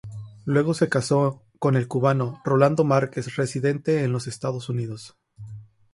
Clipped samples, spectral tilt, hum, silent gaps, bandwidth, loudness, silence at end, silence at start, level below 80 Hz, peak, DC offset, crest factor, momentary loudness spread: under 0.1%; -7 dB/octave; none; none; 11.5 kHz; -23 LUFS; 0.3 s; 0.05 s; -60 dBFS; -4 dBFS; under 0.1%; 18 dB; 15 LU